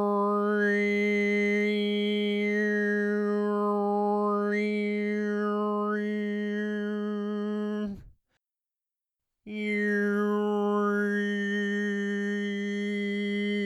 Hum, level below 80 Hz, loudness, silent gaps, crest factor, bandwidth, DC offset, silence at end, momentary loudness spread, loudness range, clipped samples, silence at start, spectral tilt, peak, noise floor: none; -68 dBFS; -28 LUFS; none; 12 dB; 8 kHz; under 0.1%; 0 s; 6 LU; 7 LU; under 0.1%; 0 s; -6.5 dB/octave; -16 dBFS; -90 dBFS